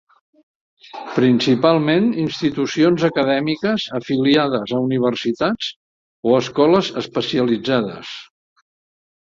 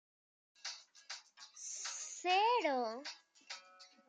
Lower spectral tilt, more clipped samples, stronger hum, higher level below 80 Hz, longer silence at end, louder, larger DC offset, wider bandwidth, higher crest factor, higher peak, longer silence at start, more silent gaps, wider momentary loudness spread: first, -6 dB/octave vs 0.5 dB/octave; neither; neither; first, -58 dBFS vs under -90 dBFS; first, 1.1 s vs 0.25 s; first, -18 LUFS vs -38 LUFS; neither; second, 7.6 kHz vs 9.6 kHz; about the same, 18 dB vs 20 dB; first, -2 dBFS vs -22 dBFS; first, 0.95 s vs 0.65 s; first, 5.76-6.23 s vs none; second, 10 LU vs 19 LU